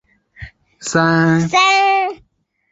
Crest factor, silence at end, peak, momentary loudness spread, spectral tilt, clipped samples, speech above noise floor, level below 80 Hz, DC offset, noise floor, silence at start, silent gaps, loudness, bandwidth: 16 dB; 0.55 s; -2 dBFS; 10 LU; -4.5 dB/octave; under 0.1%; 24 dB; -50 dBFS; under 0.1%; -38 dBFS; 0.4 s; none; -14 LUFS; 8 kHz